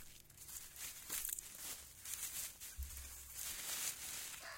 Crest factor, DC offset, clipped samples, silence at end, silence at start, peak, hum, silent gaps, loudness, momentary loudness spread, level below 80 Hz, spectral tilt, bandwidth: 26 dB; under 0.1%; under 0.1%; 0 s; 0 s; -22 dBFS; none; none; -45 LUFS; 9 LU; -60 dBFS; 0 dB/octave; 17 kHz